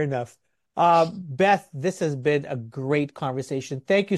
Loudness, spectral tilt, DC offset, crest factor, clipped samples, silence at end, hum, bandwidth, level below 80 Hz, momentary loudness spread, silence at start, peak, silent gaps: -24 LUFS; -6 dB/octave; under 0.1%; 16 dB; under 0.1%; 0 s; none; 12.5 kHz; -66 dBFS; 12 LU; 0 s; -8 dBFS; none